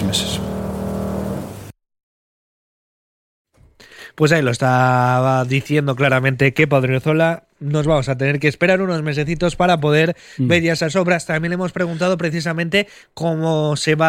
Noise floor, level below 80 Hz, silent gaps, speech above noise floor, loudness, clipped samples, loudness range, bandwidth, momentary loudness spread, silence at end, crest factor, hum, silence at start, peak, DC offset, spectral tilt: -47 dBFS; -44 dBFS; 2.03-3.45 s; 30 dB; -18 LUFS; under 0.1%; 11 LU; 16.5 kHz; 9 LU; 0 s; 18 dB; none; 0 s; -2 dBFS; under 0.1%; -6 dB/octave